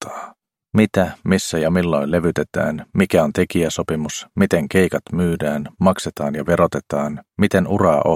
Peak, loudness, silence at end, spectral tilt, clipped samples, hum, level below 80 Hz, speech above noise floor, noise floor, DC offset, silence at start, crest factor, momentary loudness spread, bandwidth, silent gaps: 0 dBFS; -19 LUFS; 0 s; -6 dB/octave; under 0.1%; none; -46 dBFS; 24 dB; -42 dBFS; under 0.1%; 0 s; 18 dB; 7 LU; 16.5 kHz; none